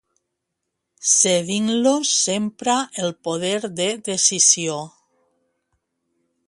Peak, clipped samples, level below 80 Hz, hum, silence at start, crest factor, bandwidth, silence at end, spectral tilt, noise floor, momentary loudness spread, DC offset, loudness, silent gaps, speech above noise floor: -2 dBFS; under 0.1%; -68 dBFS; none; 1 s; 20 dB; 11.5 kHz; 1.6 s; -2 dB/octave; -79 dBFS; 11 LU; under 0.1%; -18 LUFS; none; 59 dB